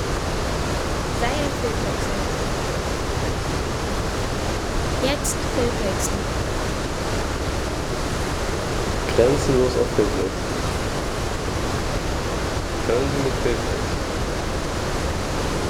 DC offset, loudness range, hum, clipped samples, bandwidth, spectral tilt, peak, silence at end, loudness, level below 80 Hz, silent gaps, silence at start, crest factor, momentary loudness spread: under 0.1%; 3 LU; none; under 0.1%; 18 kHz; -4.5 dB/octave; -4 dBFS; 0 s; -24 LUFS; -30 dBFS; none; 0 s; 18 dB; 5 LU